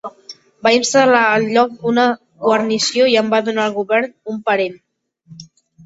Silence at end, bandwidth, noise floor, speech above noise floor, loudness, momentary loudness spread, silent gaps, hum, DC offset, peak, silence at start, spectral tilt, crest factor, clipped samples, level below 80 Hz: 0.4 s; 8 kHz; -46 dBFS; 31 dB; -15 LUFS; 8 LU; none; none; under 0.1%; 0 dBFS; 0.05 s; -3 dB/octave; 16 dB; under 0.1%; -62 dBFS